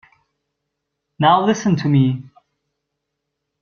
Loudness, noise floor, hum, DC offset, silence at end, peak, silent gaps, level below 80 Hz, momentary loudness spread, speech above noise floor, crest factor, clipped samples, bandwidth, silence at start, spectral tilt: -16 LUFS; -78 dBFS; none; under 0.1%; 1.35 s; -2 dBFS; none; -60 dBFS; 5 LU; 62 dB; 20 dB; under 0.1%; 7 kHz; 1.2 s; -6.5 dB/octave